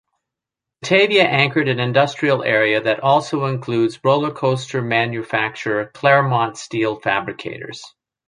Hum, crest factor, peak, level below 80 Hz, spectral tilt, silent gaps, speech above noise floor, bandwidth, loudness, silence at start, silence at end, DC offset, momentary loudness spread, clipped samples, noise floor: none; 18 dB; -2 dBFS; -62 dBFS; -5.5 dB/octave; none; 67 dB; 10.5 kHz; -18 LUFS; 0.8 s; 0.4 s; under 0.1%; 9 LU; under 0.1%; -85 dBFS